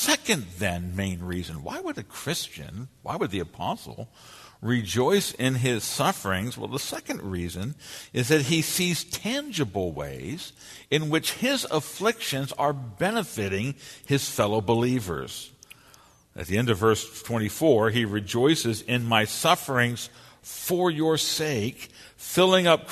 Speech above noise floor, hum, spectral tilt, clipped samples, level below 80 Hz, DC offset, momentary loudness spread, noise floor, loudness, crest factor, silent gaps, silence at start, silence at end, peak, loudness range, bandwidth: 29 dB; none; -4 dB/octave; under 0.1%; -56 dBFS; under 0.1%; 14 LU; -55 dBFS; -26 LUFS; 22 dB; none; 0 s; 0 s; -4 dBFS; 5 LU; 13.5 kHz